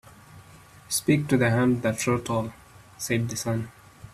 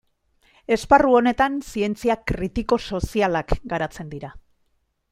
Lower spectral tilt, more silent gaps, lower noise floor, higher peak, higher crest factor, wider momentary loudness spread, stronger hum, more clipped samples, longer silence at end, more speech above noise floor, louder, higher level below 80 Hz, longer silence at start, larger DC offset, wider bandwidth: about the same, -5 dB/octave vs -6 dB/octave; neither; second, -50 dBFS vs -68 dBFS; second, -8 dBFS vs -2 dBFS; about the same, 18 dB vs 20 dB; second, 11 LU vs 18 LU; neither; neither; second, 0.05 s vs 0.7 s; second, 26 dB vs 47 dB; second, -25 LUFS vs -21 LUFS; second, -56 dBFS vs -38 dBFS; second, 0.3 s vs 0.7 s; neither; about the same, 15 kHz vs 15.5 kHz